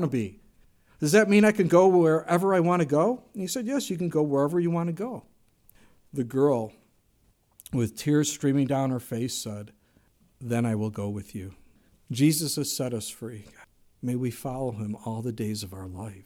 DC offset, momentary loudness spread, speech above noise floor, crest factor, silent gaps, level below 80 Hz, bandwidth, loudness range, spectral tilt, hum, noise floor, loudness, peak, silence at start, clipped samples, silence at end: under 0.1%; 18 LU; 40 dB; 20 dB; none; -62 dBFS; 17.5 kHz; 9 LU; -5.5 dB/octave; none; -66 dBFS; -26 LUFS; -6 dBFS; 0 s; under 0.1%; 0.05 s